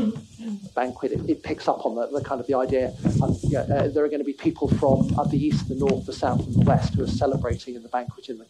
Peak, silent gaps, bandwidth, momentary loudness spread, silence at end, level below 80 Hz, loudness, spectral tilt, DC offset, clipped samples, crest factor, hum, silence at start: -6 dBFS; none; 11 kHz; 10 LU; 0.05 s; -42 dBFS; -24 LUFS; -8 dB/octave; under 0.1%; under 0.1%; 16 dB; none; 0 s